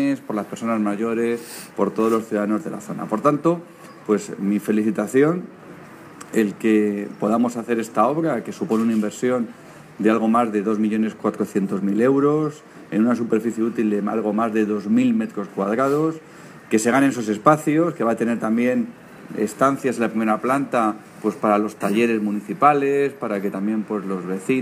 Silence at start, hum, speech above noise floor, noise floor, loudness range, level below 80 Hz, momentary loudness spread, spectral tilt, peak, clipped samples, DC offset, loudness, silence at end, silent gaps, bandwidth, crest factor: 0 s; none; 20 dB; -41 dBFS; 2 LU; -70 dBFS; 9 LU; -6.5 dB/octave; 0 dBFS; under 0.1%; under 0.1%; -21 LUFS; 0 s; none; 15.5 kHz; 20 dB